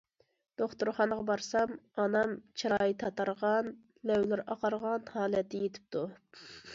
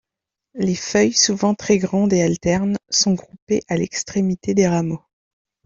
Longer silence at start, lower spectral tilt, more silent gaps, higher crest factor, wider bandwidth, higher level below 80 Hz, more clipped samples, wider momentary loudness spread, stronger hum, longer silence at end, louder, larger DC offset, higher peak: about the same, 0.6 s vs 0.55 s; about the same, -5 dB/octave vs -4.5 dB/octave; second, none vs 3.42-3.47 s; about the same, 18 dB vs 16 dB; about the same, 7.8 kHz vs 7.6 kHz; second, -70 dBFS vs -52 dBFS; neither; about the same, 10 LU vs 8 LU; neither; second, 0 s vs 0.7 s; second, -33 LUFS vs -19 LUFS; neither; second, -16 dBFS vs -2 dBFS